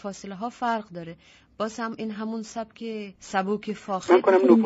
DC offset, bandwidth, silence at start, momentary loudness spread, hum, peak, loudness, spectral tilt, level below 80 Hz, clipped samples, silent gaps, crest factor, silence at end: under 0.1%; 8 kHz; 0.05 s; 18 LU; none; -2 dBFS; -26 LUFS; -5 dB/octave; -66 dBFS; under 0.1%; none; 22 dB; 0 s